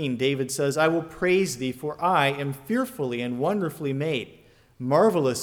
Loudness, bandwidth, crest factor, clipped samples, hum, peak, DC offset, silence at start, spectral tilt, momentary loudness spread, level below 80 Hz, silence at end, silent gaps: -25 LUFS; 19.5 kHz; 18 dB; under 0.1%; none; -6 dBFS; under 0.1%; 0 s; -5 dB/octave; 9 LU; -62 dBFS; 0 s; none